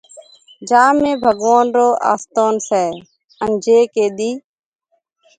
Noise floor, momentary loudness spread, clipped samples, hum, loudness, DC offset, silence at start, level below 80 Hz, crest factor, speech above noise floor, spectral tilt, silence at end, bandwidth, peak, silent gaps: -64 dBFS; 11 LU; under 0.1%; none; -15 LUFS; under 0.1%; 0.15 s; -58 dBFS; 16 dB; 49 dB; -4 dB/octave; 1 s; 9.4 kHz; 0 dBFS; 3.24-3.28 s